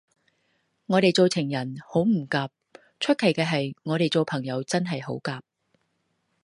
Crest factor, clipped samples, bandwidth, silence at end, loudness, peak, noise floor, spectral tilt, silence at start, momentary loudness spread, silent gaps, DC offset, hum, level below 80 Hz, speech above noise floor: 20 dB; under 0.1%; 11.5 kHz; 1.05 s; -25 LUFS; -6 dBFS; -74 dBFS; -5.5 dB/octave; 0.9 s; 10 LU; none; under 0.1%; none; -68 dBFS; 49 dB